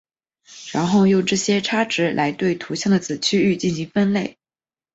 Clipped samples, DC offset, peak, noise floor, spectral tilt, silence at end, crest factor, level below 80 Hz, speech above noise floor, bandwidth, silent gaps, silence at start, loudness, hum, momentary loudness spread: under 0.1%; under 0.1%; -6 dBFS; under -90 dBFS; -5 dB/octave; 0.65 s; 16 dB; -58 dBFS; over 71 dB; 8 kHz; none; 0.5 s; -20 LUFS; none; 7 LU